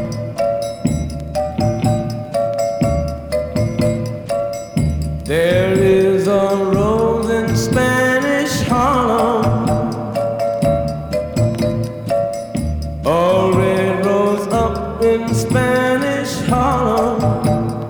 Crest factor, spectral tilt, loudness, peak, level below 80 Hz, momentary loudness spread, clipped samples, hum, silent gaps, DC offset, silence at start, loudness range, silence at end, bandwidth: 14 dB; -6.5 dB/octave; -17 LUFS; -2 dBFS; -34 dBFS; 7 LU; under 0.1%; none; none; under 0.1%; 0 s; 4 LU; 0 s; over 20 kHz